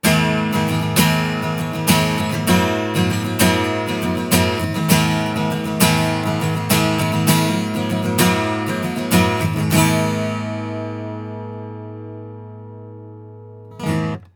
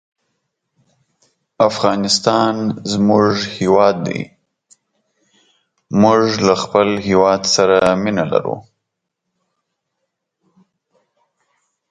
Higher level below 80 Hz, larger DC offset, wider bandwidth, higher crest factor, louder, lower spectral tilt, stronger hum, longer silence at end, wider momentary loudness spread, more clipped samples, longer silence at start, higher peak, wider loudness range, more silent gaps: first, -46 dBFS vs -52 dBFS; neither; first, over 20 kHz vs 9.6 kHz; about the same, 18 dB vs 18 dB; second, -18 LUFS vs -15 LUFS; about the same, -4.5 dB/octave vs -4.5 dB/octave; neither; second, 0.1 s vs 3.3 s; first, 18 LU vs 9 LU; neither; second, 0.05 s vs 1.6 s; about the same, 0 dBFS vs 0 dBFS; first, 11 LU vs 5 LU; neither